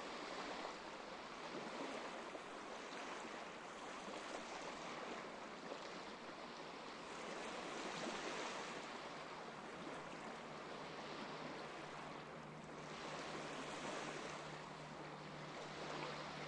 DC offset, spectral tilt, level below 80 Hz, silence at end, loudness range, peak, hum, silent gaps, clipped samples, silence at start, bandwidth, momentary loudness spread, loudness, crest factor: under 0.1%; -3.5 dB/octave; -78 dBFS; 0 s; 2 LU; -32 dBFS; none; none; under 0.1%; 0 s; 11 kHz; 5 LU; -50 LUFS; 18 dB